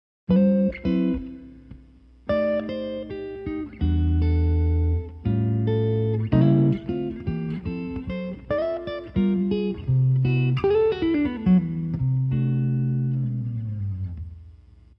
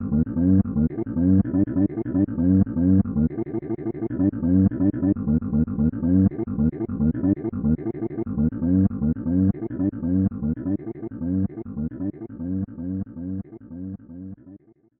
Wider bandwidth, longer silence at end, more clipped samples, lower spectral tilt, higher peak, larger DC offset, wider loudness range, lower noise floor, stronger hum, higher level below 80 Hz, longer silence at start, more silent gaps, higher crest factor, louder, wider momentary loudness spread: first, 5.6 kHz vs 2.3 kHz; about the same, 0.45 s vs 0.4 s; neither; second, -11.5 dB/octave vs -15 dB/octave; about the same, -8 dBFS vs -6 dBFS; neither; second, 5 LU vs 8 LU; about the same, -50 dBFS vs -49 dBFS; neither; about the same, -38 dBFS vs -40 dBFS; first, 0.3 s vs 0 s; neither; about the same, 16 dB vs 16 dB; about the same, -24 LUFS vs -23 LUFS; about the same, 11 LU vs 12 LU